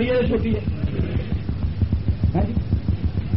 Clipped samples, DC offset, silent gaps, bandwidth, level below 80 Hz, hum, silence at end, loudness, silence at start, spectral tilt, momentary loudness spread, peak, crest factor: under 0.1%; 2%; none; 5.8 kHz; -28 dBFS; none; 0 s; -23 LUFS; 0 s; -8 dB/octave; 5 LU; -8 dBFS; 12 dB